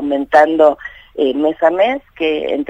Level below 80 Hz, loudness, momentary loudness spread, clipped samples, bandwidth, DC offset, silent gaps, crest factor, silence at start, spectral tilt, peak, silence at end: -50 dBFS; -14 LUFS; 8 LU; under 0.1%; 7.8 kHz; under 0.1%; none; 14 dB; 0 s; -5 dB/octave; 0 dBFS; 0.05 s